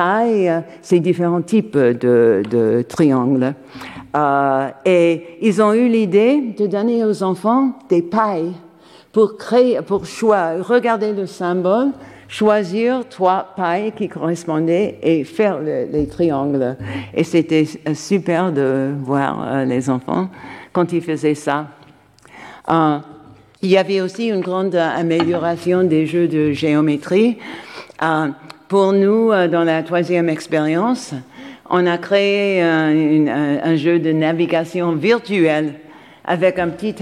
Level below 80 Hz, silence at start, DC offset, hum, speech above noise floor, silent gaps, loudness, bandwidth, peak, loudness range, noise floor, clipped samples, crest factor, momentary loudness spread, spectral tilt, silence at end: -56 dBFS; 0 s; under 0.1%; none; 31 dB; none; -17 LUFS; 12 kHz; -2 dBFS; 4 LU; -47 dBFS; under 0.1%; 16 dB; 8 LU; -7 dB/octave; 0 s